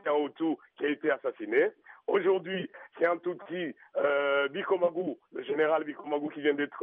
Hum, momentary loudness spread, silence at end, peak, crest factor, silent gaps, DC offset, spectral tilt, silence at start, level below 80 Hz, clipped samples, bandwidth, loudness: none; 9 LU; 0 s; -14 dBFS; 16 dB; none; under 0.1%; -3 dB/octave; 0.05 s; -86 dBFS; under 0.1%; 3.8 kHz; -30 LUFS